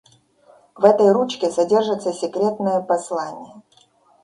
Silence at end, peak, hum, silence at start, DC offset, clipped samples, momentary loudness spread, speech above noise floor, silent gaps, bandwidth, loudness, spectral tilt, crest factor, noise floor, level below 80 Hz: 0.65 s; 0 dBFS; none; 0.75 s; under 0.1%; under 0.1%; 12 LU; 38 dB; none; 11 kHz; -19 LUFS; -5.5 dB/octave; 20 dB; -56 dBFS; -68 dBFS